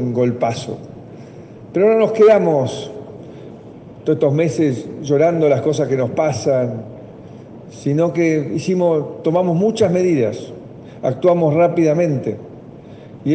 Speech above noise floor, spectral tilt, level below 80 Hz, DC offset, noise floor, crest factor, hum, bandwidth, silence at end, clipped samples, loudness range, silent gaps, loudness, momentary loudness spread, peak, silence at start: 21 dB; -7 dB/octave; -58 dBFS; under 0.1%; -37 dBFS; 14 dB; none; 9 kHz; 0 s; under 0.1%; 2 LU; none; -17 LUFS; 23 LU; -4 dBFS; 0 s